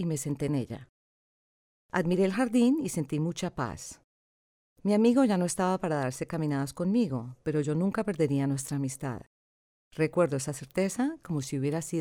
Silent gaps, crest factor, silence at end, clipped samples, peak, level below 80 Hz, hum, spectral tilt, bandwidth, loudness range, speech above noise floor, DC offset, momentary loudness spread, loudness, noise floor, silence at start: 0.89-1.89 s, 4.04-4.76 s, 9.27-9.91 s; 18 dB; 0 s; under 0.1%; -12 dBFS; -62 dBFS; none; -6 dB/octave; 17 kHz; 3 LU; over 62 dB; under 0.1%; 10 LU; -29 LUFS; under -90 dBFS; 0 s